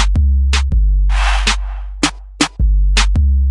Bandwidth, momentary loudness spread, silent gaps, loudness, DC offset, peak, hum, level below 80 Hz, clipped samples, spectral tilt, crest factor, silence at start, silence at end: 11.5 kHz; 5 LU; none; -16 LUFS; under 0.1%; 0 dBFS; none; -14 dBFS; under 0.1%; -4 dB/octave; 12 dB; 0 s; 0 s